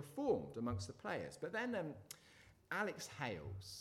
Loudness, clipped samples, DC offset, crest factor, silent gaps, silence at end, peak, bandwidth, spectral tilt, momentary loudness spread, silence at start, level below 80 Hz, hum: -44 LUFS; under 0.1%; under 0.1%; 20 dB; none; 0 s; -26 dBFS; 16 kHz; -5 dB/octave; 14 LU; 0 s; -70 dBFS; none